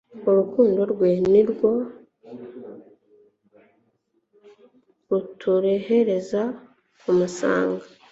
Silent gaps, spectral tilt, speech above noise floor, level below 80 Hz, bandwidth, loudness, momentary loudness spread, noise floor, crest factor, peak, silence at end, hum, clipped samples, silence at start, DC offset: none; -7 dB/octave; 49 dB; -64 dBFS; 8 kHz; -21 LUFS; 22 LU; -69 dBFS; 18 dB; -6 dBFS; 0.25 s; none; under 0.1%; 0.15 s; under 0.1%